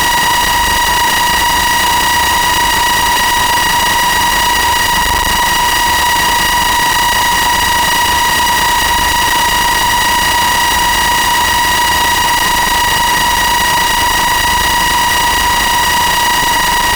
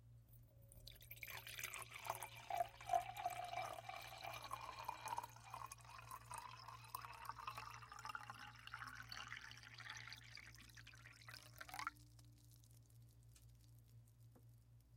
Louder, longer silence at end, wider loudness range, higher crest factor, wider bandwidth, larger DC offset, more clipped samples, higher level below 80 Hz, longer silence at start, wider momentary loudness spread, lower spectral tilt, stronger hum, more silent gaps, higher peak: first, -10 LUFS vs -52 LUFS; about the same, 0 s vs 0 s; second, 0 LU vs 10 LU; second, 8 dB vs 26 dB; first, over 20 kHz vs 16.5 kHz; first, 0.4% vs under 0.1%; neither; first, -28 dBFS vs -72 dBFS; about the same, 0 s vs 0 s; second, 0 LU vs 19 LU; second, -1 dB/octave vs -2.5 dB/octave; neither; neither; first, -4 dBFS vs -28 dBFS